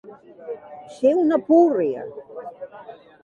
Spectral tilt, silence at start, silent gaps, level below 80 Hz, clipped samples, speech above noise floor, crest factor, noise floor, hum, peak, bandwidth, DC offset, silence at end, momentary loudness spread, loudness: -7.5 dB/octave; 0.05 s; none; -72 dBFS; under 0.1%; 23 dB; 18 dB; -43 dBFS; none; -4 dBFS; 7.4 kHz; under 0.1%; 0.3 s; 24 LU; -19 LUFS